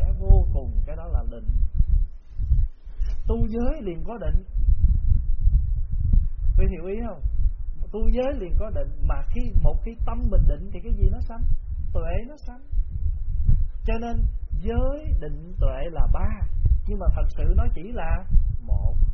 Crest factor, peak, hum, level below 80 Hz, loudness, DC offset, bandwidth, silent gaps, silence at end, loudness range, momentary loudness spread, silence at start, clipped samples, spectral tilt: 16 dB; -4 dBFS; none; -22 dBFS; -27 LUFS; under 0.1%; 3.1 kHz; none; 0 s; 3 LU; 8 LU; 0 s; under 0.1%; -9 dB/octave